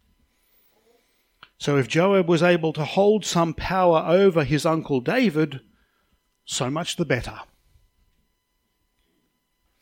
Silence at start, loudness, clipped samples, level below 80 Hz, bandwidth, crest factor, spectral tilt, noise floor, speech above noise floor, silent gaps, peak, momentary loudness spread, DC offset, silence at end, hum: 1.6 s; -21 LUFS; under 0.1%; -50 dBFS; 17 kHz; 18 dB; -5.5 dB/octave; -72 dBFS; 52 dB; none; -6 dBFS; 9 LU; under 0.1%; 2.35 s; none